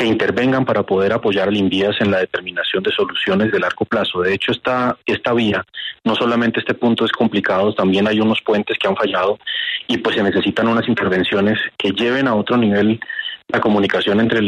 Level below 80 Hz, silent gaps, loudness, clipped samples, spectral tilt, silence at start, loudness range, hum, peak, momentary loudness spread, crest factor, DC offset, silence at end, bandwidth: -54 dBFS; none; -17 LUFS; under 0.1%; -6.5 dB/octave; 0 s; 1 LU; none; -4 dBFS; 4 LU; 12 dB; under 0.1%; 0 s; 9.6 kHz